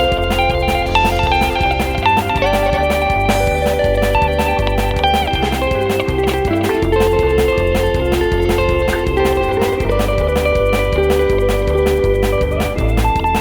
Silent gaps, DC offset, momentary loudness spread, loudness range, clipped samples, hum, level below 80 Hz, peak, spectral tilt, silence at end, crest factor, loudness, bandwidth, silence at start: none; under 0.1%; 2 LU; 1 LU; under 0.1%; none; -22 dBFS; 0 dBFS; -5.5 dB/octave; 0 s; 14 dB; -15 LUFS; over 20 kHz; 0 s